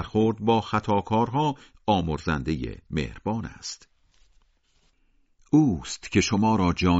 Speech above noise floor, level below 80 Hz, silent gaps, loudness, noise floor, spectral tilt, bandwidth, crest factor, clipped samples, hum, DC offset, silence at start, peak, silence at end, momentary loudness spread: 41 dB; -44 dBFS; none; -25 LUFS; -65 dBFS; -5.5 dB/octave; 8 kHz; 18 dB; under 0.1%; none; under 0.1%; 0 s; -8 dBFS; 0 s; 10 LU